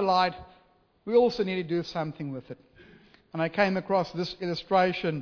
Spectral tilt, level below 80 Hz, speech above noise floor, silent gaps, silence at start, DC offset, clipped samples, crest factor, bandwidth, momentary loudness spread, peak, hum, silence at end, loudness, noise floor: -6.5 dB/octave; -60 dBFS; 36 dB; none; 0 s; under 0.1%; under 0.1%; 20 dB; 5.4 kHz; 17 LU; -8 dBFS; none; 0 s; -27 LUFS; -63 dBFS